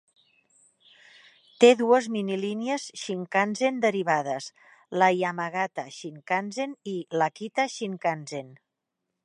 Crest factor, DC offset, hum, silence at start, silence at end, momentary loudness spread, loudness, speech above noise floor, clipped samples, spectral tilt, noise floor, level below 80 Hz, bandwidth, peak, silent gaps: 24 dB; under 0.1%; none; 1.6 s; 0.7 s; 14 LU; -26 LUFS; 57 dB; under 0.1%; -4.5 dB/octave; -83 dBFS; -82 dBFS; 11 kHz; -4 dBFS; none